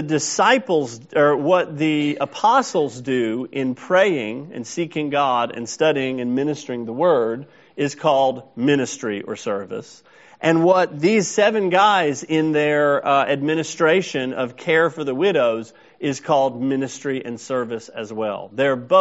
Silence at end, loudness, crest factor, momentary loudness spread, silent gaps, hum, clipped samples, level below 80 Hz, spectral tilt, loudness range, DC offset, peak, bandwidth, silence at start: 0 s; -20 LUFS; 18 dB; 10 LU; none; none; under 0.1%; -68 dBFS; -3.5 dB/octave; 4 LU; under 0.1%; -2 dBFS; 8 kHz; 0 s